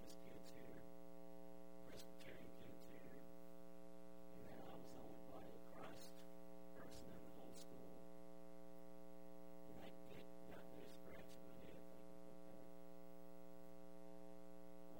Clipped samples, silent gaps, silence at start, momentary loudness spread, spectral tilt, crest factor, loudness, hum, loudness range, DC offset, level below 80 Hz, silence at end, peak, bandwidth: under 0.1%; none; 0 s; 3 LU; -5.5 dB/octave; 16 dB; -61 LUFS; none; 2 LU; 0.2%; -78 dBFS; 0 s; -42 dBFS; 16 kHz